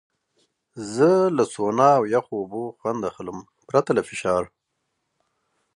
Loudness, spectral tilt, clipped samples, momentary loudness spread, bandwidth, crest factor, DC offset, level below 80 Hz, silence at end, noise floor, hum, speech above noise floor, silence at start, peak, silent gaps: -22 LUFS; -6 dB/octave; under 0.1%; 18 LU; 11 kHz; 20 dB; under 0.1%; -62 dBFS; 1.3 s; -77 dBFS; none; 55 dB; 0.75 s; -4 dBFS; none